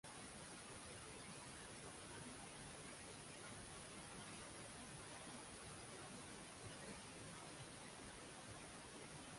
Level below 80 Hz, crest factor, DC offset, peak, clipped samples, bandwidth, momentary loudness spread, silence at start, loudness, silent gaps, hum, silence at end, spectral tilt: -72 dBFS; 14 dB; under 0.1%; -42 dBFS; under 0.1%; 11.5 kHz; 1 LU; 0.05 s; -55 LUFS; none; none; 0 s; -3 dB/octave